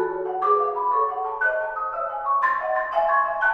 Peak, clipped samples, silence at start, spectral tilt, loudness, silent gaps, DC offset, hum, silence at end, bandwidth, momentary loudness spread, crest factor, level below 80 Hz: -10 dBFS; under 0.1%; 0 s; -5.5 dB/octave; -23 LUFS; none; under 0.1%; none; 0 s; 6.2 kHz; 6 LU; 14 dB; -58 dBFS